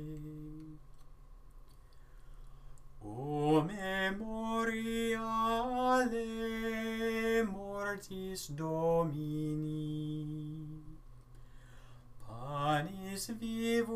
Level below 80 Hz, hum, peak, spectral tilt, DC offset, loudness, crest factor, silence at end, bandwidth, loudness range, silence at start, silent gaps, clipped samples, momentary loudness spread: -54 dBFS; none; -18 dBFS; -5.5 dB/octave; under 0.1%; -36 LUFS; 20 dB; 0 s; 15.5 kHz; 8 LU; 0 s; none; under 0.1%; 16 LU